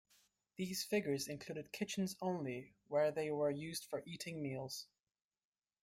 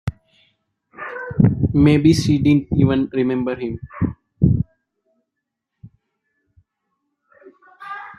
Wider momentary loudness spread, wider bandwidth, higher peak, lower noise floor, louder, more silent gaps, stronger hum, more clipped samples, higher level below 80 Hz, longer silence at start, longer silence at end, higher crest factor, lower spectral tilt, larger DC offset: second, 10 LU vs 17 LU; first, 16 kHz vs 12 kHz; second, -26 dBFS vs -2 dBFS; first, under -90 dBFS vs -80 dBFS; second, -41 LUFS vs -18 LUFS; neither; neither; neither; second, -78 dBFS vs -40 dBFS; first, 0.6 s vs 0.05 s; first, 1 s vs 0.05 s; about the same, 16 dB vs 18 dB; second, -4.5 dB/octave vs -7.5 dB/octave; neither